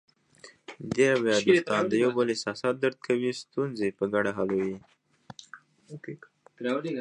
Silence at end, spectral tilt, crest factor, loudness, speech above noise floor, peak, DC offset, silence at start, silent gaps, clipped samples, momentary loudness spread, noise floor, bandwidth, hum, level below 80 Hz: 0 s; -5 dB/octave; 20 dB; -27 LUFS; 28 dB; -8 dBFS; under 0.1%; 0.45 s; none; under 0.1%; 23 LU; -54 dBFS; 10.5 kHz; none; -68 dBFS